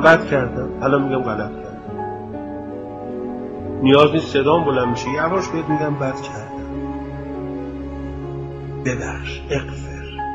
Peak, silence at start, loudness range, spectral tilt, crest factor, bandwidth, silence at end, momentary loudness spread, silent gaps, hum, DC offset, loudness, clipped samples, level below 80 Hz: 0 dBFS; 0 s; 9 LU; -6.5 dB/octave; 20 dB; 8.2 kHz; 0 s; 14 LU; none; none; under 0.1%; -21 LUFS; under 0.1%; -38 dBFS